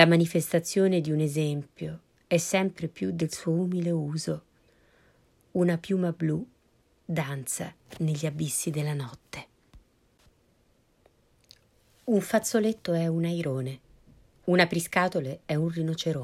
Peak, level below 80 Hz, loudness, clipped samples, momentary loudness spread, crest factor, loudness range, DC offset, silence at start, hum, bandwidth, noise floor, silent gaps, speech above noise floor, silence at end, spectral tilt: -4 dBFS; -64 dBFS; -28 LUFS; under 0.1%; 14 LU; 24 dB; 7 LU; under 0.1%; 0 s; none; 15 kHz; -66 dBFS; none; 39 dB; 0 s; -5.5 dB/octave